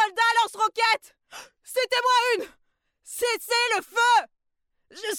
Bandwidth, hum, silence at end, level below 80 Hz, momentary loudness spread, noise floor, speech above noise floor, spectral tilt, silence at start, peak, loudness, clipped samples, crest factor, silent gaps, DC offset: 18 kHz; none; 0 s; -74 dBFS; 18 LU; -75 dBFS; 50 dB; 1 dB/octave; 0 s; -10 dBFS; -23 LUFS; under 0.1%; 16 dB; none; under 0.1%